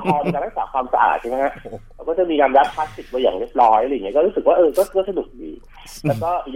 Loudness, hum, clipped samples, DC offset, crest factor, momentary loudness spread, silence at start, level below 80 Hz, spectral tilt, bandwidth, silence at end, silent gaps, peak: -19 LUFS; none; under 0.1%; under 0.1%; 16 dB; 16 LU; 0 s; -44 dBFS; -6 dB/octave; 16 kHz; 0 s; none; -2 dBFS